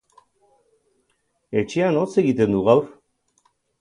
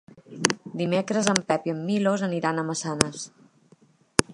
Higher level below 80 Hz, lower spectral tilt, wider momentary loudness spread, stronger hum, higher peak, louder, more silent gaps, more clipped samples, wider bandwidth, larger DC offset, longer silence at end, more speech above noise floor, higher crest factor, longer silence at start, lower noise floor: about the same, -56 dBFS vs -52 dBFS; first, -7 dB/octave vs -4 dB/octave; first, 9 LU vs 6 LU; neither; about the same, -2 dBFS vs 0 dBFS; first, -20 LUFS vs -25 LUFS; neither; neither; about the same, 11 kHz vs 11.5 kHz; neither; first, 0.9 s vs 0 s; first, 51 dB vs 34 dB; about the same, 22 dB vs 26 dB; first, 1.5 s vs 0.15 s; first, -70 dBFS vs -59 dBFS